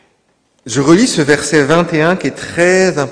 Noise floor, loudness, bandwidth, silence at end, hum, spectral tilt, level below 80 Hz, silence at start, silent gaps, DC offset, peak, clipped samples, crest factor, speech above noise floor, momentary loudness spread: -58 dBFS; -12 LUFS; 11 kHz; 0 s; none; -4.5 dB/octave; -46 dBFS; 0.65 s; none; under 0.1%; 0 dBFS; 0.8%; 12 dB; 47 dB; 7 LU